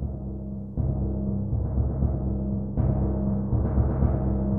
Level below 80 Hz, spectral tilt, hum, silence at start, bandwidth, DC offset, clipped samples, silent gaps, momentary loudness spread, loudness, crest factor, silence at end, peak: -30 dBFS; -14.5 dB/octave; none; 0 s; 2.1 kHz; 0.7%; under 0.1%; none; 8 LU; -27 LUFS; 16 dB; 0 s; -10 dBFS